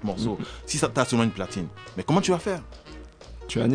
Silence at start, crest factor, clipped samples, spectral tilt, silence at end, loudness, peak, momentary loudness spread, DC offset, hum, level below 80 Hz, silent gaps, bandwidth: 0 s; 20 dB; under 0.1%; -5 dB/octave; 0 s; -26 LUFS; -6 dBFS; 21 LU; under 0.1%; none; -48 dBFS; none; 10 kHz